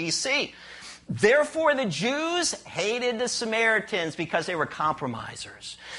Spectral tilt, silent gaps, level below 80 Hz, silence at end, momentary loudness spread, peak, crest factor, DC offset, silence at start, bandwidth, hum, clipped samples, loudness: -3 dB/octave; none; -62 dBFS; 0 s; 16 LU; -6 dBFS; 20 dB; under 0.1%; 0 s; 11.5 kHz; none; under 0.1%; -25 LUFS